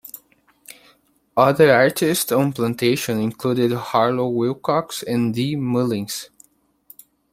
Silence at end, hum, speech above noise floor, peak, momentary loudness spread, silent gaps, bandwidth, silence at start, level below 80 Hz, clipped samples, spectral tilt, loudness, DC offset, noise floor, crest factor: 1.05 s; none; 39 dB; -2 dBFS; 11 LU; none; 16.5 kHz; 0.05 s; -60 dBFS; under 0.1%; -5 dB/octave; -19 LUFS; under 0.1%; -58 dBFS; 18 dB